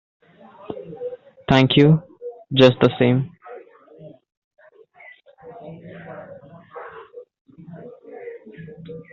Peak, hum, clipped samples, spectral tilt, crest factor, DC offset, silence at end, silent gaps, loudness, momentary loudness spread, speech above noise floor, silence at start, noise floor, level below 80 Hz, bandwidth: 0 dBFS; none; under 0.1%; -5.5 dB/octave; 22 dB; under 0.1%; 0.1 s; 4.37-4.51 s, 7.41-7.45 s; -17 LUFS; 27 LU; 34 dB; 0.7 s; -49 dBFS; -54 dBFS; 7.4 kHz